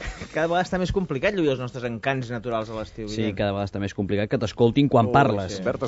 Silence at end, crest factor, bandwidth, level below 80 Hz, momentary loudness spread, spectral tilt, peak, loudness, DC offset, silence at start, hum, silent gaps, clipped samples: 0 s; 18 dB; 7.6 kHz; -44 dBFS; 10 LU; -5.5 dB/octave; -6 dBFS; -24 LUFS; under 0.1%; 0 s; none; none; under 0.1%